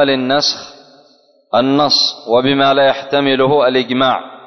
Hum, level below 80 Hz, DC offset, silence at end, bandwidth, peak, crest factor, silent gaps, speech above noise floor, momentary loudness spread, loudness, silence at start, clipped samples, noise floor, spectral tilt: none; -58 dBFS; under 0.1%; 0.05 s; 6.4 kHz; -2 dBFS; 12 dB; none; 38 dB; 5 LU; -13 LUFS; 0 s; under 0.1%; -51 dBFS; -4 dB/octave